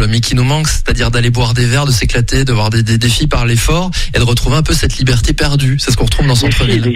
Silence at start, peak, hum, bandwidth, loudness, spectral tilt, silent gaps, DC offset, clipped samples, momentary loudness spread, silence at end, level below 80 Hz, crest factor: 0 s; 0 dBFS; none; 15.5 kHz; -12 LUFS; -4.5 dB/octave; none; under 0.1%; under 0.1%; 2 LU; 0 s; -18 dBFS; 10 dB